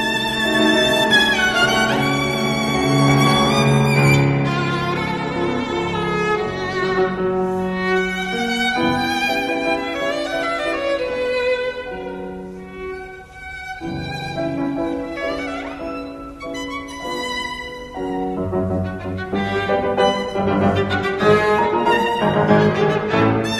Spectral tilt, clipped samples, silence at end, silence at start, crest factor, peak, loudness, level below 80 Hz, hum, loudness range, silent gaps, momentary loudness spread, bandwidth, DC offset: -5 dB/octave; under 0.1%; 0 s; 0 s; 18 dB; -2 dBFS; -19 LUFS; -44 dBFS; none; 10 LU; none; 14 LU; 13 kHz; under 0.1%